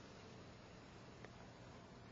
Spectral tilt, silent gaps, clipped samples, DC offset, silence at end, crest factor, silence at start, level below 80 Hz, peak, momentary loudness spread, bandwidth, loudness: -4.5 dB/octave; none; under 0.1%; under 0.1%; 0 s; 20 dB; 0 s; -72 dBFS; -38 dBFS; 1 LU; 7.4 kHz; -59 LUFS